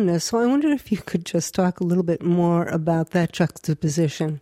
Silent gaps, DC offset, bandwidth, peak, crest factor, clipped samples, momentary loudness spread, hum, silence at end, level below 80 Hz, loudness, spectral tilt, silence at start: none; under 0.1%; 15 kHz; -8 dBFS; 14 dB; under 0.1%; 5 LU; none; 0 s; -56 dBFS; -22 LUFS; -6 dB/octave; 0 s